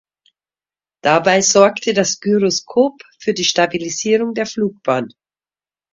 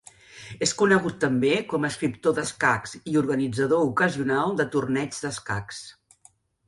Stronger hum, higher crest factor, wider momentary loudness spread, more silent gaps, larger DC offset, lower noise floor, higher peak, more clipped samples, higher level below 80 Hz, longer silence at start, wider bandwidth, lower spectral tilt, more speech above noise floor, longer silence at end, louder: neither; about the same, 18 dB vs 20 dB; about the same, 9 LU vs 10 LU; neither; neither; first, under -90 dBFS vs -59 dBFS; first, 0 dBFS vs -4 dBFS; neither; about the same, -60 dBFS vs -58 dBFS; first, 1.05 s vs 0.35 s; second, 7.8 kHz vs 11.5 kHz; second, -3 dB/octave vs -4.5 dB/octave; first, over 74 dB vs 35 dB; about the same, 0.85 s vs 0.75 s; first, -16 LUFS vs -24 LUFS